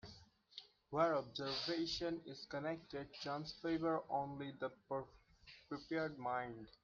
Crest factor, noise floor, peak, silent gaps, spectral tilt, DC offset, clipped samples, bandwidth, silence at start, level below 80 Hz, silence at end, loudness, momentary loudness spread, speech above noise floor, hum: 20 dB; -65 dBFS; -24 dBFS; none; -5.5 dB/octave; under 0.1%; under 0.1%; 7.4 kHz; 0.05 s; -72 dBFS; 0.15 s; -43 LUFS; 18 LU; 22 dB; none